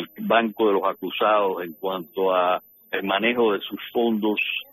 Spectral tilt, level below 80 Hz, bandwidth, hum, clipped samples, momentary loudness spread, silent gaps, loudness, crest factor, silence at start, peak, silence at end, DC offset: -7.5 dB/octave; -72 dBFS; 13 kHz; none; under 0.1%; 9 LU; none; -23 LUFS; 16 dB; 0 s; -6 dBFS; 0.1 s; under 0.1%